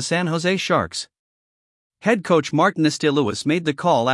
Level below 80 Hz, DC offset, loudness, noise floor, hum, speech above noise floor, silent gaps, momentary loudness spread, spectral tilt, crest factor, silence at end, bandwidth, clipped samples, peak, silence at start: -62 dBFS; under 0.1%; -20 LUFS; under -90 dBFS; none; over 71 dB; 1.19-1.90 s; 7 LU; -5 dB/octave; 16 dB; 0 s; 12 kHz; under 0.1%; -4 dBFS; 0 s